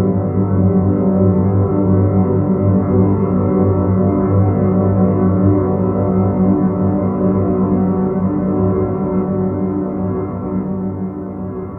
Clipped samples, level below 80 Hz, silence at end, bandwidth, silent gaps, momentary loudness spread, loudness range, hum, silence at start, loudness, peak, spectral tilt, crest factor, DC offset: under 0.1%; -38 dBFS; 0 s; 2.4 kHz; none; 7 LU; 4 LU; none; 0 s; -15 LUFS; 0 dBFS; -14.5 dB/octave; 14 dB; under 0.1%